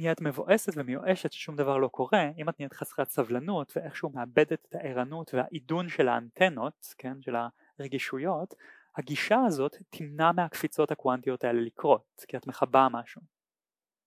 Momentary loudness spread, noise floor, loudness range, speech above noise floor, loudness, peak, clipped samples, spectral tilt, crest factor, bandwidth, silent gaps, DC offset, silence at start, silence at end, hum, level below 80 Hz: 13 LU; under -90 dBFS; 4 LU; over 61 dB; -29 LUFS; -6 dBFS; under 0.1%; -5.5 dB/octave; 24 dB; 16 kHz; none; under 0.1%; 0 s; 0.9 s; none; -80 dBFS